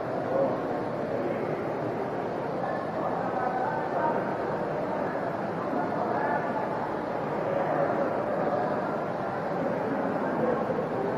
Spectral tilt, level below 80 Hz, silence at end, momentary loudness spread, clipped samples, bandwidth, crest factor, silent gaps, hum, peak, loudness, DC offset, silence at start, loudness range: -8 dB/octave; -62 dBFS; 0 s; 4 LU; under 0.1%; 13.5 kHz; 14 dB; none; none; -14 dBFS; -29 LUFS; under 0.1%; 0 s; 2 LU